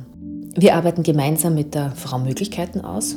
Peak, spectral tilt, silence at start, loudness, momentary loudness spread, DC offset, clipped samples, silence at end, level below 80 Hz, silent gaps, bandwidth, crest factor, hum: 0 dBFS; -5.5 dB/octave; 0 s; -20 LUFS; 12 LU; under 0.1%; under 0.1%; 0 s; -50 dBFS; none; 18.5 kHz; 20 dB; none